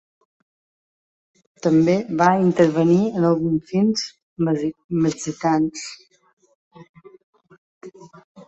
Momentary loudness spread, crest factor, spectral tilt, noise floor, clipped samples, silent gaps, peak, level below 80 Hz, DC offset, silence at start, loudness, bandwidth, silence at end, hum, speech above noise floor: 9 LU; 20 dB; -6.5 dB/octave; under -90 dBFS; under 0.1%; 4.23-4.36 s, 4.84-4.89 s, 6.33-6.37 s, 6.55-6.71 s, 6.89-6.94 s, 7.23-7.33 s, 7.58-7.81 s, 8.24-8.35 s; -2 dBFS; -60 dBFS; under 0.1%; 1.65 s; -20 LUFS; 8.2 kHz; 0.05 s; none; over 71 dB